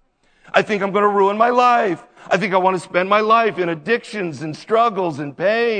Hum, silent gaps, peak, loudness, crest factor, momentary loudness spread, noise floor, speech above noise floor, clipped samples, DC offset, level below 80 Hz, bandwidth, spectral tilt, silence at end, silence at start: none; none; 0 dBFS; -17 LUFS; 18 dB; 10 LU; -52 dBFS; 34 dB; under 0.1%; under 0.1%; -66 dBFS; 9.4 kHz; -5.5 dB/octave; 0 s; 0.55 s